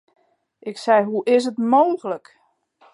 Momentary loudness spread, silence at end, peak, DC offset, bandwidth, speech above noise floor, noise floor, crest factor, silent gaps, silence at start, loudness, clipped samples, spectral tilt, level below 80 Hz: 16 LU; 0.75 s; -4 dBFS; under 0.1%; 11.5 kHz; 39 dB; -58 dBFS; 18 dB; none; 0.65 s; -19 LUFS; under 0.1%; -5.5 dB/octave; -80 dBFS